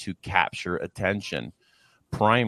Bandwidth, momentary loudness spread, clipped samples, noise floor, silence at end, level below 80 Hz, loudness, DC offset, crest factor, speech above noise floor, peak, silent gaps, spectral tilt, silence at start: 12.5 kHz; 11 LU; under 0.1%; -63 dBFS; 0 s; -54 dBFS; -27 LUFS; under 0.1%; 24 dB; 37 dB; -2 dBFS; none; -5.5 dB/octave; 0 s